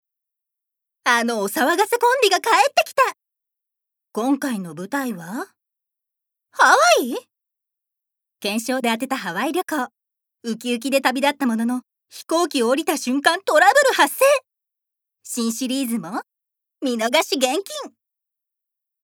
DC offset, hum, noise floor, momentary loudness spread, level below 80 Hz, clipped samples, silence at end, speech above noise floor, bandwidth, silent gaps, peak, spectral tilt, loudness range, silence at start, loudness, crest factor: under 0.1%; none; -84 dBFS; 16 LU; -86 dBFS; under 0.1%; 1.2 s; 65 dB; over 20 kHz; none; 0 dBFS; -2.5 dB/octave; 7 LU; 1.05 s; -19 LUFS; 20 dB